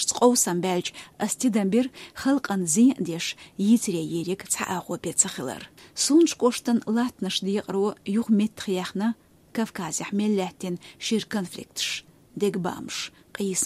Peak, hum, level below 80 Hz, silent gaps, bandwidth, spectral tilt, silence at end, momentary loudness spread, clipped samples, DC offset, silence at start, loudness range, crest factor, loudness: -6 dBFS; none; -66 dBFS; none; 15.5 kHz; -4 dB/octave; 0 s; 13 LU; under 0.1%; under 0.1%; 0 s; 5 LU; 20 dB; -25 LUFS